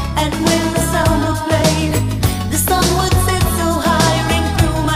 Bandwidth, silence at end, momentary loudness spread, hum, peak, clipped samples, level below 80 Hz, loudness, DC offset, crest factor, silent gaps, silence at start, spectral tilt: 16 kHz; 0 s; 3 LU; none; 0 dBFS; under 0.1%; -24 dBFS; -15 LUFS; under 0.1%; 14 dB; none; 0 s; -4.5 dB/octave